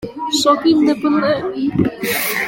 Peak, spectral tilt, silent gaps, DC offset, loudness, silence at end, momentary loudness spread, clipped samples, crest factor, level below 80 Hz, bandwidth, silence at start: -2 dBFS; -4 dB/octave; none; under 0.1%; -16 LUFS; 0 s; 6 LU; under 0.1%; 14 dB; -48 dBFS; 17 kHz; 0 s